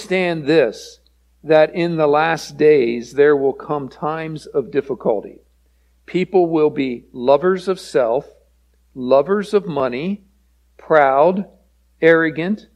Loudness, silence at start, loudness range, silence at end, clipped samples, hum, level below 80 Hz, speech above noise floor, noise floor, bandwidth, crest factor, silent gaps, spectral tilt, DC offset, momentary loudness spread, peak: -17 LUFS; 0 s; 4 LU; 0.15 s; under 0.1%; none; -56 dBFS; 40 dB; -57 dBFS; 11.5 kHz; 18 dB; none; -6.5 dB/octave; under 0.1%; 11 LU; 0 dBFS